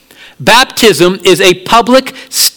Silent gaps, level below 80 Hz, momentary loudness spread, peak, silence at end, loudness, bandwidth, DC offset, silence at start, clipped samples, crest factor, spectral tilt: none; -40 dBFS; 4 LU; 0 dBFS; 0.05 s; -7 LUFS; over 20 kHz; under 0.1%; 0.4 s; 4%; 8 dB; -2.5 dB/octave